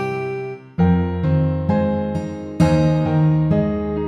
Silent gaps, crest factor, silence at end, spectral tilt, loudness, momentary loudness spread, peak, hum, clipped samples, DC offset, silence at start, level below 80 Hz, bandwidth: none; 16 dB; 0 s; -9 dB/octave; -19 LUFS; 10 LU; -4 dBFS; none; under 0.1%; under 0.1%; 0 s; -36 dBFS; 10 kHz